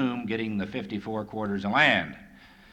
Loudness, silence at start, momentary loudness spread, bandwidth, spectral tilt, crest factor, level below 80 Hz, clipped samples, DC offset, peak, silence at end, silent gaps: -27 LUFS; 0 s; 13 LU; 9.4 kHz; -6 dB/octave; 20 dB; -58 dBFS; under 0.1%; under 0.1%; -8 dBFS; 0.25 s; none